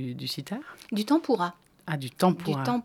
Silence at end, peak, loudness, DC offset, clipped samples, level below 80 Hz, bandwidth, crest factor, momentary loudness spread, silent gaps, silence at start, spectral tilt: 0 s; -8 dBFS; -29 LUFS; under 0.1%; under 0.1%; -72 dBFS; 17.5 kHz; 20 dB; 12 LU; none; 0 s; -6 dB/octave